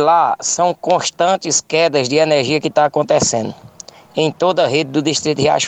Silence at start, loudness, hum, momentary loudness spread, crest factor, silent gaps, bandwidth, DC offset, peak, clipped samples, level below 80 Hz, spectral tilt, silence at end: 0 s; -15 LUFS; none; 5 LU; 14 dB; none; 9.6 kHz; under 0.1%; -2 dBFS; under 0.1%; -56 dBFS; -3.5 dB/octave; 0 s